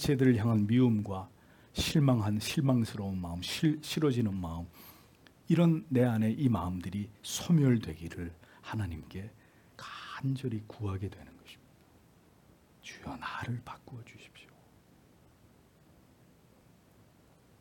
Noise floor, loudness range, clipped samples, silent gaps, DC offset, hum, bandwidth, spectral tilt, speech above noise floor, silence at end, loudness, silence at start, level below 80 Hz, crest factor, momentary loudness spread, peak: -62 dBFS; 15 LU; under 0.1%; none; under 0.1%; none; 18 kHz; -6.5 dB/octave; 32 dB; 3.2 s; -31 LUFS; 0 s; -60 dBFS; 20 dB; 22 LU; -14 dBFS